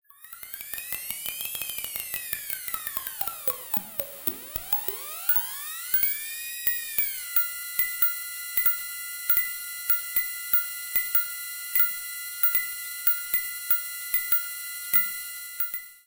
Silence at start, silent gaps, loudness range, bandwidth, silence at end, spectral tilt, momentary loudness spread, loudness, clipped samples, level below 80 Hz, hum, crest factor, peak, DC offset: 0.2 s; none; 6 LU; 17.5 kHz; 0.05 s; 0.5 dB/octave; 10 LU; -25 LUFS; under 0.1%; -62 dBFS; none; 24 dB; -4 dBFS; under 0.1%